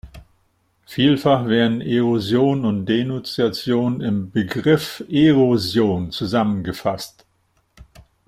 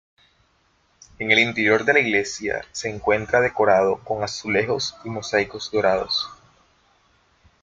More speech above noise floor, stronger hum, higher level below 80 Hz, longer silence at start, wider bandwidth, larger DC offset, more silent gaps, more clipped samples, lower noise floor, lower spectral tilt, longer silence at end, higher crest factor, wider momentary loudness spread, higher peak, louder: first, 46 dB vs 42 dB; neither; about the same, -52 dBFS vs -56 dBFS; second, 0.05 s vs 1.2 s; first, 16 kHz vs 9.2 kHz; neither; neither; neither; about the same, -64 dBFS vs -63 dBFS; first, -6.5 dB/octave vs -3.5 dB/octave; second, 0.45 s vs 1.3 s; about the same, 18 dB vs 20 dB; about the same, 8 LU vs 10 LU; about the same, -2 dBFS vs -2 dBFS; about the same, -19 LUFS vs -21 LUFS